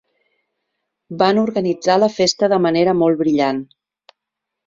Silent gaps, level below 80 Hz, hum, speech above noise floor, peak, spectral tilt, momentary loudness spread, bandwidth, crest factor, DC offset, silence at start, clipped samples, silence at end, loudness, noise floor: none; -60 dBFS; none; 66 dB; -2 dBFS; -5 dB/octave; 5 LU; 7.8 kHz; 16 dB; under 0.1%; 1.1 s; under 0.1%; 1 s; -16 LUFS; -81 dBFS